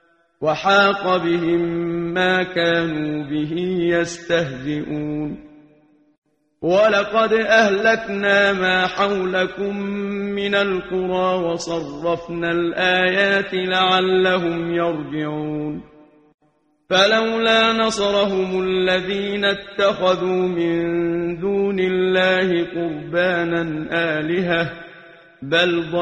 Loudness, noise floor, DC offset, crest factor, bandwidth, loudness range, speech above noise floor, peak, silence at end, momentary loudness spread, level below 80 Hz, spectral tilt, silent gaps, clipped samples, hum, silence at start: -19 LUFS; -63 dBFS; under 0.1%; 18 dB; 9.8 kHz; 4 LU; 44 dB; -2 dBFS; 0 s; 10 LU; -52 dBFS; -5 dB/octave; 6.18-6.22 s, 16.34-16.38 s; under 0.1%; none; 0.4 s